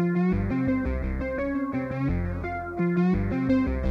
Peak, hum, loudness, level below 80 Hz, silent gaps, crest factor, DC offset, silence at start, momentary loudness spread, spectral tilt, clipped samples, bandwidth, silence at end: -12 dBFS; none; -27 LUFS; -36 dBFS; none; 12 dB; under 0.1%; 0 s; 6 LU; -10 dB/octave; under 0.1%; 6 kHz; 0 s